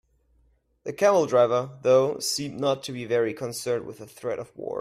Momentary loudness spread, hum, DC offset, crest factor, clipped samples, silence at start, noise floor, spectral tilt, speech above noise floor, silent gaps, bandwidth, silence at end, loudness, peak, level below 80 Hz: 13 LU; none; under 0.1%; 16 dB; under 0.1%; 0.85 s; -65 dBFS; -4 dB/octave; 40 dB; none; 15.5 kHz; 0 s; -25 LUFS; -8 dBFS; -66 dBFS